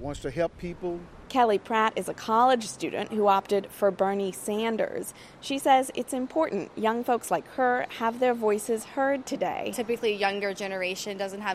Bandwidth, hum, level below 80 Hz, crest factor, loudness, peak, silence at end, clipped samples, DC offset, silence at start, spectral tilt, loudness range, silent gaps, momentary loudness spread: 16 kHz; none; -58 dBFS; 18 dB; -27 LUFS; -10 dBFS; 0 s; under 0.1%; under 0.1%; 0 s; -4 dB/octave; 2 LU; none; 10 LU